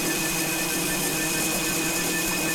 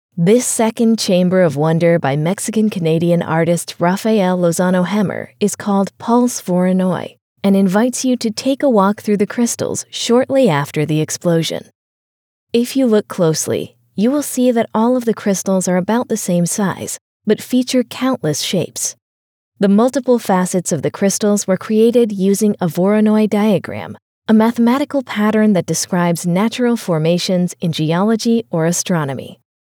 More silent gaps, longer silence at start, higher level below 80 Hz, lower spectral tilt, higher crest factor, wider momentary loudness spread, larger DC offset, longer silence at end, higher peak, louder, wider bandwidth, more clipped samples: second, none vs 7.21-7.36 s, 11.75-12.47 s, 17.01-17.20 s, 19.02-19.52 s, 24.02-24.22 s; second, 0 s vs 0.15 s; first, -46 dBFS vs -84 dBFS; second, -2 dB/octave vs -5.5 dB/octave; about the same, 10 dB vs 14 dB; second, 1 LU vs 6 LU; neither; second, 0 s vs 0.35 s; second, -16 dBFS vs 0 dBFS; second, -23 LUFS vs -15 LUFS; about the same, over 20 kHz vs over 20 kHz; neither